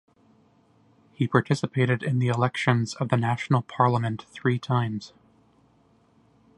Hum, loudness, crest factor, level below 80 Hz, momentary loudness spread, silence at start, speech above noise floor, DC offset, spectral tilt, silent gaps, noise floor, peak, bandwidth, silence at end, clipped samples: none; -25 LUFS; 24 dB; -64 dBFS; 7 LU; 1.2 s; 37 dB; under 0.1%; -7 dB/octave; none; -61 dBFS; -4 dBFS; 10.5 kHz; 1.5 s; under 0.1%